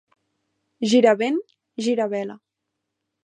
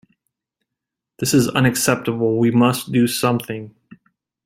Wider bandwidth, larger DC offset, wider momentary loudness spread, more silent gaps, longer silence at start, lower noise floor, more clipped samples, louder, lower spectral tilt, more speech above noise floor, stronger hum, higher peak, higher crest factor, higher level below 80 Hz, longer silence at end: second, 10.5 kHz vs 16.5 kHz; neither; first, 14 LU vs 9 LU; neither; second, 0.8 s vs 1.2 s; about the same, -81 dBFS vs -83 dBFS; neither; second, -21 LUFS vs -18 LUFS; about the same, -4.5 dB/octave vs -5 dB/octave; second, 61 dB vs 66 dB; neither; about the same, -4 dBFS vs -2 dBFS; about the same, 20 dB vs 18 dB; second, -80 dBFS vs -54 dBFS; about the same, 0.85 s vs 0.75 s